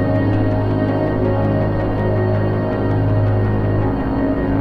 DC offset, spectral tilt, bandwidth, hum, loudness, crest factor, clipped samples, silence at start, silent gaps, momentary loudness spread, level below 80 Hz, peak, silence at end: under 0.1%; -10.5 dB/octave; 4.9 kHz; none; -18 LUFS; 10 dB; under 0.1%; 0 s; none; 2 LU; -30 dBFS; -6 dBFS; 0 s